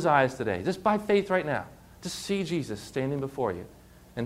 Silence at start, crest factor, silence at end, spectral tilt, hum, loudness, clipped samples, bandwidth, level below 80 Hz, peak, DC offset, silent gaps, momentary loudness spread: 0 s; 20 dB; 0 s; -5.5 dB/octave; none; -29 LUFS; under 0.1%; 16 kHz; -58 dBFS; -8 dBFS; under 0.1%; none; 16 LU